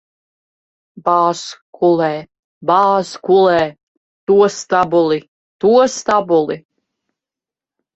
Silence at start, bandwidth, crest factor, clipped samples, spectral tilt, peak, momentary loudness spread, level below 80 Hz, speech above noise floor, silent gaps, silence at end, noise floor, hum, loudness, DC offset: 0.95 s; 8.2 kHz; 16 dB; under 0.1%; -5 dB/octave; 0 dBFS; 12 LU; -58 dBFS; 74 dB; 1.61-1.73 s, 2.39-2.61 s, 3.83-4.27 s, 5.28-5.59 s; 1.35 s; -88 dBFS; none; -15 LUFS; under 0.1%